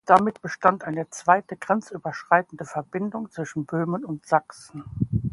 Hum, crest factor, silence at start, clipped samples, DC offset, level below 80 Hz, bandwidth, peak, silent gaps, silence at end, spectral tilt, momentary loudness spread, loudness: none; 24 dB; 0.05 s; under 0.1%; under 0.1%; -50 dBFS; 11.5 kHz; 0 dBFS; none; 0 s; -6.5 dB/octave; 12 LU; -25 LUFS